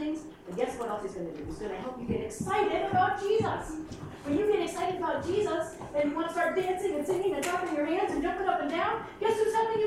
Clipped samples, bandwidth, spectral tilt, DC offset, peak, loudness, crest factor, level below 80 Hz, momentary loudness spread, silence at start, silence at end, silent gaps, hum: under 0.1%; 15 kHz; -5 dB/octave; under 0.1%; -14 dBFS; -30 LUFS; 16 dB; -54 dBFS; 10 LU; 0 s; 0 s; none; none